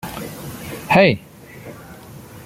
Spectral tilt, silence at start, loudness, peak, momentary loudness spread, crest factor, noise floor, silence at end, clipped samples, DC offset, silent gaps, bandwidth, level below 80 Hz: -5.5 dB/octave; 0.05 s; -16 LUFS; -2 dBFS; 25 LU; 20 dB; -39 dBFS; 0 s; under 0.1%; under 0.1%; none; 16.5 kHz; -50 dBFS